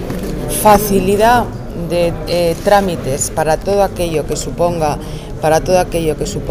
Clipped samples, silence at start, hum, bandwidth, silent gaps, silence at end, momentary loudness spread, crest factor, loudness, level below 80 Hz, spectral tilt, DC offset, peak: under 0.1%; 0 s; none; 16 kHz; none; 0 s; 10 LU; 14 dB; -15 LUFS; -28 dBFS; -5 dB/octave; under 0.1%; 0 dBFS